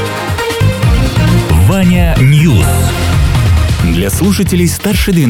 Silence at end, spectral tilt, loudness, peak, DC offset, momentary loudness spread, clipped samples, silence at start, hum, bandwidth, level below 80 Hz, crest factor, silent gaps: 0 s; -6 dB/octave; -10 LUFS; 0 dBFS; under 0.1%; 4 LU; under 0.1%; 0 s; none; 17 kHz; -16 dBFS; 8 dB; none